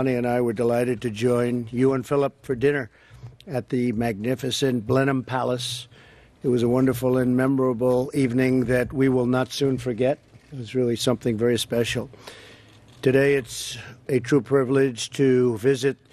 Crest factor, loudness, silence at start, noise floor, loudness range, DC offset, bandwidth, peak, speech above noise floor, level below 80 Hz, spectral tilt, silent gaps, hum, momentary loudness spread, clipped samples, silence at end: 16 dB; -23 LUFS; 0 s; -49 dBFS; 3 LU; under 0.1%; 14.5 kHz; -6 dBFS; 27 dB; -54 dBFS; -6 dB/octave; none; none; 10 LU; under 0.1%; 0.2 s